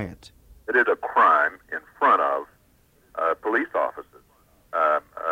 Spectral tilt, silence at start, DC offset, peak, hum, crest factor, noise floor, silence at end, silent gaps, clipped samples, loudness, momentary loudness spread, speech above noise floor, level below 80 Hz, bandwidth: -5.5 dB/octave; 0 s; under 0.1%; -8 dBFS; none; 16 dB; -60 dBFS; 0 s; none; under 0.1%; -22 LUFS; 17 LU; 38 dB; -60 dBFS; 16 kHz